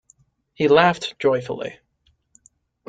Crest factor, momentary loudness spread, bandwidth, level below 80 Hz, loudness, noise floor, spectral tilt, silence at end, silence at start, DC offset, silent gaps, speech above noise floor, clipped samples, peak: 20 dB; 15 LU; 9.2 kHz; -62 dBFS; -19 LUFS; -65 dBFS; -5.5 dB/octave; 1.15 s; 0.6 s; under 0.1%; none; 46 dB; under 0.1%; -2 dBFS